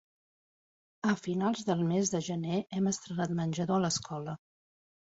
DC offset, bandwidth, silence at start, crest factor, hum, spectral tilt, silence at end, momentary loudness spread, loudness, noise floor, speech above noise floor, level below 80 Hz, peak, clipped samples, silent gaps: under 0.1%; 8 kHz; 1.05 s; 18 dB; none; -5 dB/octave; 0.75 s; 7 LU; -32 LUFS; under -90 dBFS; over 59 dB; -68 dBFS; -16 dBFS; under 0.1%; none